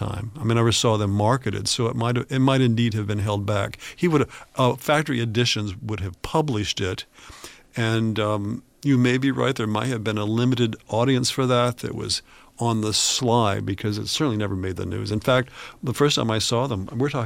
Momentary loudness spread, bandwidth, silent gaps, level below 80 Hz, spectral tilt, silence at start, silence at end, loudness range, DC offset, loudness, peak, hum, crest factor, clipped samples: 9 LU; 16 kHz; none; -50 dBFS; -5 dB/octave; 0 s; 0 s; 3 LU; under 0.1%; -23 LUFS; -6 dBFS; none; 18 dB; under 0.1%